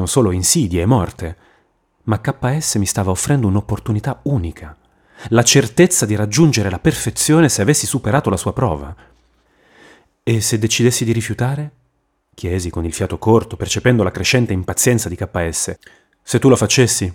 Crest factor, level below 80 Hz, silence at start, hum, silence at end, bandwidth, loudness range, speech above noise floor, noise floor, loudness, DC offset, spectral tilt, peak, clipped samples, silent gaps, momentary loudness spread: 16 dB; -40 dBFS; 0 s; none; 0 s; 17.5 kHz; 5 LU; 49 dB; -65 dBFS; -16 LUFS; under 0.1%; -4.5 dB/octave; -2 dBFS; under 0.1%; none; 11 LU